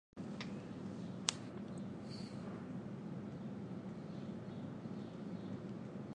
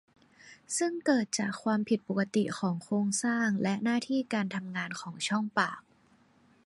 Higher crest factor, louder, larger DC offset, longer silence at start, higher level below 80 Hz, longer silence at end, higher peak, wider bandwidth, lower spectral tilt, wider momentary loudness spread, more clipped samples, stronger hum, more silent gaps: first, 38 dB vs 20 dB; second, -46 LUFS vs -31 LUFS; neither; second, 0.15 s vs 0.45 s; about the same, -72 dBFS vs -74 dBFS; second, 0 s vs 0.85 s; first, -8 dBFS vs -12 dBFS; about the same, 11 kHz vs 11.5 kHz; about the same, -4.5 dB/octave vs -4.5 dB/octave; about the same, 8 LU vs 7 LU; neither; neither; neither